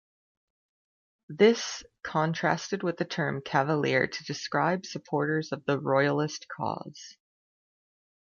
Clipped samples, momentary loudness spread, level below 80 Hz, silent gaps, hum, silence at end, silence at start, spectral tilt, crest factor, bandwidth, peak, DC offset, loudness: under 0.1%; 12 LU; -70 dBFS; none; none; 1.25 s; 1.3 s; -5 dB/octave; 22 dB; 7.2 kHz; -8 dBFS; under 0.1%; -28 LUFS